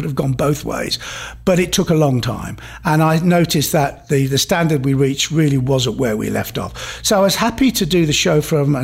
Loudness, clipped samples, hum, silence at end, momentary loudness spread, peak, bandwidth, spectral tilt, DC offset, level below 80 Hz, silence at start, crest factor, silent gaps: -16 LUFS; under 0.1%; none; 0 s; 8 LU; -4 dBFS; 16 kHz; -5 dB/octave; under 0.1%; -38 dBFS; 0 s; 12 dB; none